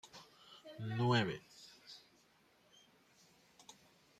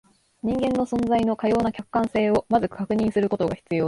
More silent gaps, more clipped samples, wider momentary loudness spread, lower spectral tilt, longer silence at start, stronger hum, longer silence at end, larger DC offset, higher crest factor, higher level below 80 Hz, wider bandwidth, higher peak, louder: neither; neither; first, 26 LU vs 4 LU; second, -6 dB/octave vs -7.5 dB/octave; second, 0.05 s vs 0.45 s; neither; first, 2.2 s vs 0 s; neither; first, 22 dB vs 16 dB; second, -76 dBFS vs -50 dBFS; first, 13 kHz vs 11.5 kHz; second, -20 dBFS vs -8 dBFS; second, -37 LUFS vs -23 LUFS